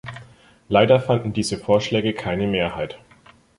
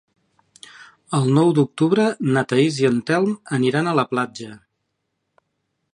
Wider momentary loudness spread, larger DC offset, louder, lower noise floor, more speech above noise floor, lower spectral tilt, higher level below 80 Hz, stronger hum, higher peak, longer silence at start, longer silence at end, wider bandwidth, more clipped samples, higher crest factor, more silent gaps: first, 17 LU vs 8 LU; neither; about the same, -20 LUFS vs -19 LUFS; second, -52 dBFS vs -75 dBFS; second, 32 dB vs 56 dB; about the same, -5.5 dB/octave vs -6.5 dB/octave; first, -48 dBFS vs -66 dBFS; neither; about the same, -2 dBFS vs -2 dBFS; second, 0.05 s vs 0.8 s; second, 0.65 s vs 1.35 s; about the same, 11.5 kHz vs 11 kHz; neither; about the same, 20 dB vs 18 dB; neither